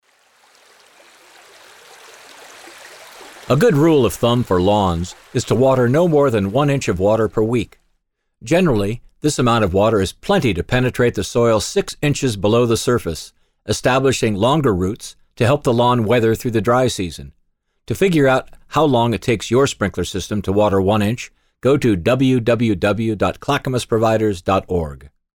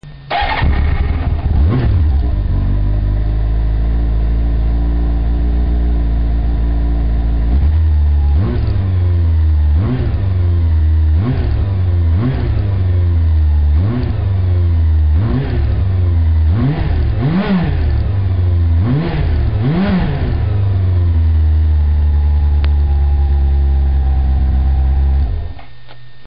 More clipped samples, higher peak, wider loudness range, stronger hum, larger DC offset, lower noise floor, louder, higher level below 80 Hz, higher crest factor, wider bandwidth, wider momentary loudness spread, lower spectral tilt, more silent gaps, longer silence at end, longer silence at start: neither; about the same, -4 dBFS vs -6 dBFS; about the same, 2 LU vs 2 LU; neither; second, under 0.1% vs 4%; first, -69 dBFS vs -40 dBFS; about the same, -17 LUFS vs -15 LUFS; second, -40 dBFS vs -14 dBFS; first, 14 dB vs 8 dB; first, 19 kHz vs 5 kHz; first, 10 LU vs 4 LU; second, -6 dB/octave vs -12 dB/octave; neither; about the same, 0.4 s vs 0.35 s; first, 2.4 s vs 0 s